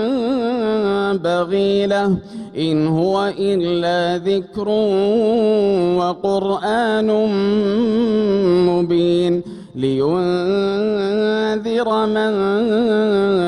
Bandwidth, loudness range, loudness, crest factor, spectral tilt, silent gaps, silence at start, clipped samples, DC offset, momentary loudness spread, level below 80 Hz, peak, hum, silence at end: 10.5 kHz; 2 LU; -17 LUFS; 10 dB; -7 dB/octave; none; 0 s; under 0.1%; under 0.1%; 4 LU; -52 dBFS; -6 dBFS; none; 0 s